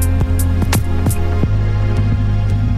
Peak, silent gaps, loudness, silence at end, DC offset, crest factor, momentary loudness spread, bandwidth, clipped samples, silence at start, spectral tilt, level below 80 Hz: -2 dBFS; none; -17 LUFS; 0 s; under 0.1%; 12 dB; 1 LU; 15.5 kHz; under 0.1%; 0 s; -6.5 dB/octave; -20 dBFS